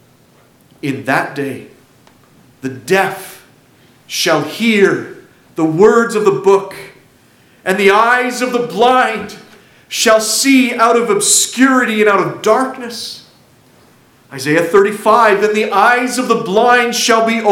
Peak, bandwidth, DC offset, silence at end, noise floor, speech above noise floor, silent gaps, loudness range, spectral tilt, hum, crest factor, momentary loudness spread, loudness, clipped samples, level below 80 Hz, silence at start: 0 dBFS; 17 kHz; under 0.1%; 0 s; -49 dBFS; 36 dB; none; 8 LU; -3 dB/octave; none; 14 dB; 15 LU; -12 LUFS; under 0.1%; -58 dBFS; 0.85 s